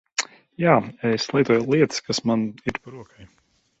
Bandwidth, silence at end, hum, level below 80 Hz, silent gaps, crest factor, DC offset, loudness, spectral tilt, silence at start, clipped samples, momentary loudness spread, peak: 8.2 kHz; 0.55 s; none; -56 dBFS; none; 20 dB; under 0.1%; -22 LUFS; -5 dB/octave; 0.2 s; under 0.1%; 15 LU; -2 dBFS